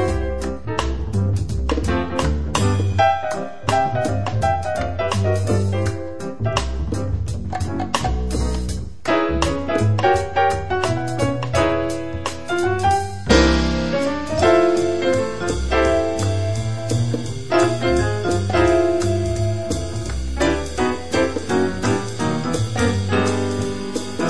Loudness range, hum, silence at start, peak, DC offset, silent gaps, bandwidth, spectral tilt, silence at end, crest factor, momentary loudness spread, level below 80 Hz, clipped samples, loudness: 4 LU; none; 0 s; -2 dBFS; 2%; none; 11 kHz; -5.5 dB/octave; 0 s; 18 dB; 8 LU; -30 dBFS; under 0.1%; -20 LUFS